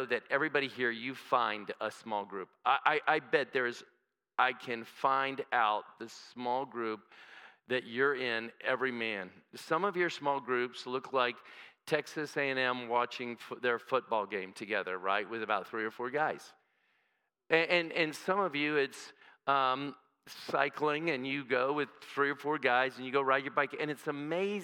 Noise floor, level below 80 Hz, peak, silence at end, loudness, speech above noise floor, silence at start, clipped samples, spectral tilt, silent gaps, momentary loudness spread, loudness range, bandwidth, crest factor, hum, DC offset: -80 dBFS; under -90 dBFS; -10 dBFS; 0 s; -33 LUFS; 46 dB; 0 s; under 0.1%; -4.5 dB/octave; none; 11 LU; 3 LU; 17 kHz; 24 dB; none; under 0.1%